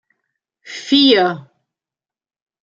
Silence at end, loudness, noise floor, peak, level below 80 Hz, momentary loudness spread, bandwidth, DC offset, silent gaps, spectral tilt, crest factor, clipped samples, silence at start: 1.25 s; -13 LUFS; under -90 dBFS; -2 dBFS; -66 dBFS; 21 LU; 7.4 kHz; under 0.1%; none; -4.5 dB/octave; 18 dB; under 0.1%; 0.65 s